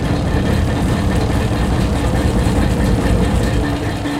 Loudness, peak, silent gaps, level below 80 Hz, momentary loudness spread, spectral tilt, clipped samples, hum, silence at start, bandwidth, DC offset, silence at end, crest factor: -17 LUFS; -2 dBFS; none; -20 dBFS; 2 LU; -6.5 dB/octave; under 0.1%; none; 0 s; 15.5 kHz; under 0.1%; 0 s; 12 dB